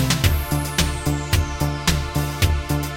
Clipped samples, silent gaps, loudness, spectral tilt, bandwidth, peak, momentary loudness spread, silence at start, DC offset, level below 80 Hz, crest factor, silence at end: under 0.1%; none; -21 LUFS; -4.5 dB/octave; 17 kHz; -4 dBFS; 4 LU; 0 s; under 0.1%; -26 dBFS; 16 dB; 0 s